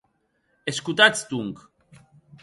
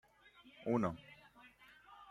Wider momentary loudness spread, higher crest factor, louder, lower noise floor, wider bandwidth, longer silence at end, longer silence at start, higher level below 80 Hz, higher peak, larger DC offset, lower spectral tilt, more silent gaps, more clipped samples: second, 17 LU vs 25 LU; about the same, 24 dB vs 22 dB; first, -21 LUFS vs -40 LUFS; first, -70 dBFS vs -65 dBFS; about the same, 11.5 kHz vs 11.5 kHz; first, 0.9 s vs 0 s; first, 0.65 s vs 0.45 s; first, -66 dBFS vs -72 dBFS; first, -2 dBFS vs -22 dBFS; neither; second, -2.5 dB/octave vs -8 dB/octave; neither; neither